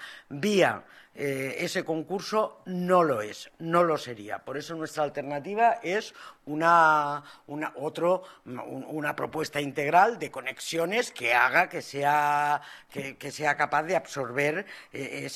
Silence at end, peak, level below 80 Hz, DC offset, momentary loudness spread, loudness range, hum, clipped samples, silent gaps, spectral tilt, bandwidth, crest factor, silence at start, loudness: 0 s; -6 dBFS; -72 dBFS; under 0.1%; 16 LU; 3 LU; none; under 0.1%; none; -4.5 dB/octave; 14.5 kHz; 20 dB; 0 s; -27 LUFS